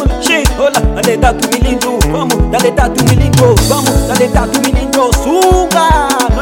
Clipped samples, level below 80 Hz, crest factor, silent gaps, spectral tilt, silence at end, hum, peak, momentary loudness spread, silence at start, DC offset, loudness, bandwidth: 1%; -16 dBFS; 10 dB; none; -4.5 dB/octave; 0 s; none; 0 dBFS; 4 LU; 0 s; under 0.1%; -10 LUFS; 17.5 kHz